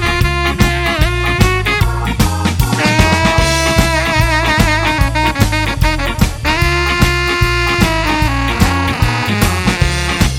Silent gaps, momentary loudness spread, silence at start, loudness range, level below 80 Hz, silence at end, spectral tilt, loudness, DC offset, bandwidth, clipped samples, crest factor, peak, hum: none; 3 LU; 0 s; 1 LU; -20 dBFS; 0 s; -4.5 dB/octave; -13 LUFS; under 0.1%; 17 kHz; under 0.1%; 12 dB; 0 dBFS; none